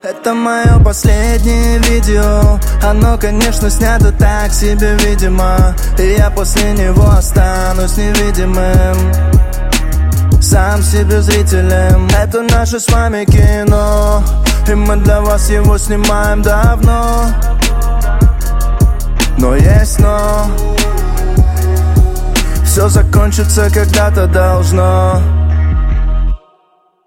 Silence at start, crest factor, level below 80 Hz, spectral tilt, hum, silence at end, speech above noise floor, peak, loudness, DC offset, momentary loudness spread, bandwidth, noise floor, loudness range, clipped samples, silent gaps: 0.05 s; 8 dB; -10 dBFS; -5.5 dB/octave; none; 0.7 s; 45 dB; 0 dBFS; -11 LUFS; under 0.1%; 5 LU; 16.5 kHz; -53 dBFS; 2 LU; under 0.1%; none